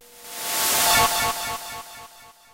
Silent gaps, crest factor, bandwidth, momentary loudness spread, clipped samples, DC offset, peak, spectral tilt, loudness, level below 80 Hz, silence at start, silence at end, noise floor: none; 16 dB; 16 kHz; 20 LU; under 0.1%; under 0.1%; -8 dBFS; -0.5 dB/octave; -20 LUFS; -48 dBFS; 0.1 s; 0.2 s; -47 dBFS